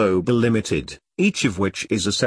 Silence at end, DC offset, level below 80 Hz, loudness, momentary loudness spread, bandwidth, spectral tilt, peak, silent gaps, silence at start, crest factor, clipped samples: 0 s; under 0.1%; -48 dBFS; -21 LUFS; 7 LU; 11 kHz; -5 dB/octave; -4 dBFS; none; 0 s; 16 dB; under 0.1%